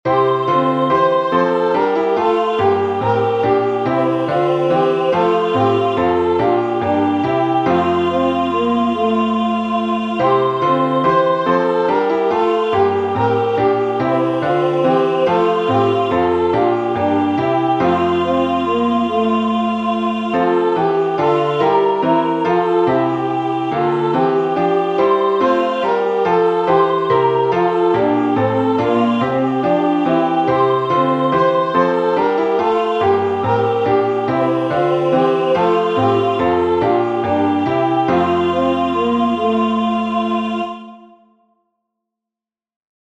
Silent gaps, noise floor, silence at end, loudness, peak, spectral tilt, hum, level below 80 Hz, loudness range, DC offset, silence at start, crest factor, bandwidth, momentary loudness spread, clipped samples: none; -88 dBFS; 2.1 s; -16 LUFS; -2 dBFS; -7.5 dB/octave; none; -52 dBFS; 1 LU; under 0.1%; 0.05 s; 14 dB; 8 kHz; 2 LU; under 0.1%